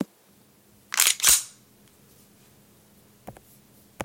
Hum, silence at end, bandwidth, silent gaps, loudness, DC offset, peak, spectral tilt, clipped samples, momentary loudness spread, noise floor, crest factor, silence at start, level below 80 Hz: none; 0 s; 17 kHz; none; -19 LUFS; under 0.1%; 0 dBFS; 1 dB/octave; under 0.1%; 20 LU; -58 dBFS; 28 dB; 0 s; -58 dBFS